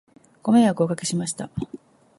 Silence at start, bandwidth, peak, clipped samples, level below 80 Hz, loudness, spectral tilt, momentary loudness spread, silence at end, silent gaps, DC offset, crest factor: 0.45 s; 11.5 kHz; -6 dBFS; under 0.1%; -56 dBFS; -22 LUFS; -5.5 dB/octave; 15 LU; 0.45 s; none; under 0.1%; 18 dB